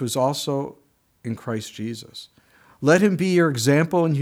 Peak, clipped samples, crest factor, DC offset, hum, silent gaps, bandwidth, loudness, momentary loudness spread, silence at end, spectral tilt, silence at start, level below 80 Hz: -4 dBFS; under 0.1%; 18 dB; under 0.1%; none; none; 17.5 kHz; -21 LUFS; 18 LU; 0 s; -5.5 dB/octave; 0 s; -66 dBFS